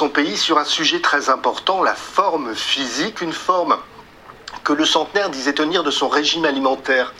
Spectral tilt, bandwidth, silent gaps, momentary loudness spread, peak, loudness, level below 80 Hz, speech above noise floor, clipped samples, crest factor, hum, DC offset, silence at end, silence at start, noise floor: -2 dB/octave; 15 kHz; none; 6 LU; 0 dBFS; -18 LUFS; -58 dBFS; 23 dB; under 0.1%; 18 dB; none; under 0.1%; 0 s; 0 s; -42 dBFS